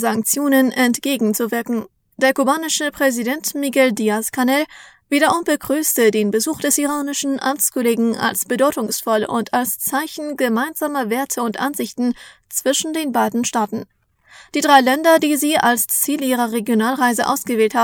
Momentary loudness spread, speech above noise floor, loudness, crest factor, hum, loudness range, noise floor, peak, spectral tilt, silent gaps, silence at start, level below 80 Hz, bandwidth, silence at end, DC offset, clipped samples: 7 LU; 29 dB; -18 LUFS; 18 dB; none; 5 LU; -47 dBFS; 0 dBFS; -2.5 dB/octave; none; 0 s; -62 dBFS; over 20 kHz; 0 s; under 0.1%; under 0.1%